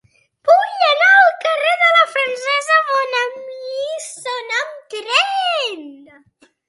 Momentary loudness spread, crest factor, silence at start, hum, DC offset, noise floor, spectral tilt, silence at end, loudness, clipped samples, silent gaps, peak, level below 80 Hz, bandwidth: 15 LU; 16 dB; 0.45 s; none; under 0.1%; -55 dBFS; 1 dB/octave; 0.75 s; -15 LUFS; under 0.1%; none; 0 dBFS; -78 dBFS; 11.5 kHz